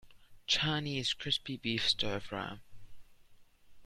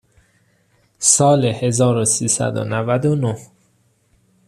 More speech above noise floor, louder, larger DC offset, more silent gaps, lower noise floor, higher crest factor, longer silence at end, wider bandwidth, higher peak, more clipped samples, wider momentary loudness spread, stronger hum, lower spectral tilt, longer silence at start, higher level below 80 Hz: second, 24 dB vs 44 dB; second, -33 LUFS vs -16 LUFS; neither; neither; about the same, -59 dBFS vs -60 dBFS; about the same, 22 dB vs 20 dB; second, 0 s vs 1 s; about the same, 14 kHz vs 14 kHz; second, -16 dBFS vs 0 dBFS; neither; first, 13 LU vs 9 LU; neither; about the same, -3.5 dB/octave vs -4.5 dB/octave; second, 0.05 s vs 1 s; about the same, -60 dBFS vs -56 dBFS